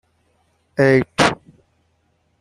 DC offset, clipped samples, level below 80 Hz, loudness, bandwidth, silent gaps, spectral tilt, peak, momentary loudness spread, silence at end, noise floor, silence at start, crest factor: under 0.1%; under 0.1%; -52 dBFS; -17 LUFS; 12 kHz; none; -5 dB/octave; -2 dBFS; 15 LU; 1.05 s; -64 dBFS; 0.8 s; 20 dB